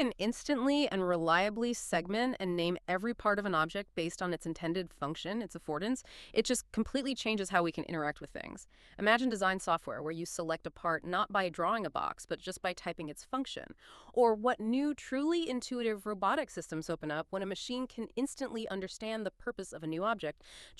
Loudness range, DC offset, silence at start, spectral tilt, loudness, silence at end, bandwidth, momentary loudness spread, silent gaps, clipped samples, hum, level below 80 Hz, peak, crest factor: 4 LU; under 0.1%; 0 s; -4.5 dB/octave; -34 LUFS; 0.05 s; 13 kHz; 10 LU; none; under 0.1%; none; -62 dBFS; -12 dBFS; 22 dB